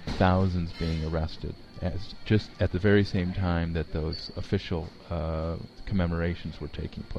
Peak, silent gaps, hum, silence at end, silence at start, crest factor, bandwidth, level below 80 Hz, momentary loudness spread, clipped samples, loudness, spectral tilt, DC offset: -8 dBFS; none; none; 0 s; 0 s; 20 dB; 7.8 kHz; -40 dBFS; 13 LU; under 0.1%; -29 LUFS; -8 dB/octave; under 0.1%